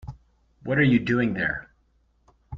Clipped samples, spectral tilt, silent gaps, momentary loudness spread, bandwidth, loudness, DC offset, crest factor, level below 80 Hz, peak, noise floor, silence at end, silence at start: under 0.1%; -8 dB/octave; none; 18 LU; 6.8 kHz; -23 LUFS; under 0.1%; 18 dB; -50 dBFS; -10 dBFS; -65 dBFS; 0 s; 0.05 s